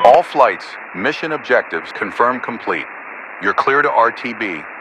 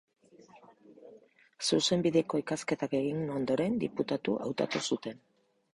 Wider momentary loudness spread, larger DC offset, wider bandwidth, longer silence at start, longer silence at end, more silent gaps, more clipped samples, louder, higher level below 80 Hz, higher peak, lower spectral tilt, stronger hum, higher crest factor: first, 12 LU vs 7 LU; neither; about the same, 11 kHz vs 11.5 kHz; second, 0 s vs 0.55 s; second, 0 s vs 0.6 s; neither; first, 0.2% vs under 0.1%; first, -17 LUFS vs -31 LUFS; first, -60 dBFS vs -68 dBFS; first, 0 dBFS vs -14 dBFS; about the same, -5 dB/octave vs -4.5 dB/octave; neither; about the same, 16 dB vs 18 dB